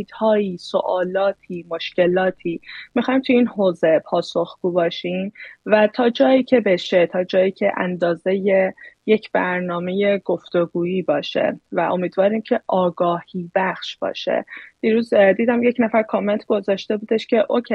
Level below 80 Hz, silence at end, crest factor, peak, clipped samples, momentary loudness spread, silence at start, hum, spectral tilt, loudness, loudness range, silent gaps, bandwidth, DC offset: -66 dBFS; 0 s; 18 dB; 0 dBFS; under 0.1%; 9 LU; 0 s; none; -7 dB/octave; -20 LUFS; 3 LU; none; 8.6 kHz; under 0.1%